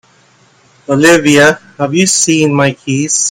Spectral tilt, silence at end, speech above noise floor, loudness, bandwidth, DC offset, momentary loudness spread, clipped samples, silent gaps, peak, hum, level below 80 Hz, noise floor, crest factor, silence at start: -3.5 dB/octave; 0 s; 38 dB; -10 LUFS; 17 kHz; under 0.1%; 9 LU; 0.5%; none; 0 dBFS; none; -50 dBFS; -48 dBFS; 12 dB; 0.9 s